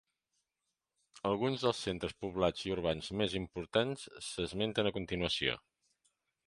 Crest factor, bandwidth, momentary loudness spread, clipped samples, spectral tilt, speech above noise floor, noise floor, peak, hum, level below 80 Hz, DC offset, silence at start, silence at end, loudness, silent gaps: 22 dB; 11.5 kHz; 7 LU; under 0.1%; -5 dB/octave; 53 dB; -88 dBFS; -14 dBFS; none; -58 dBFS; under 0.1%; 1.15 s; 0.9 s; -36 LUFS; none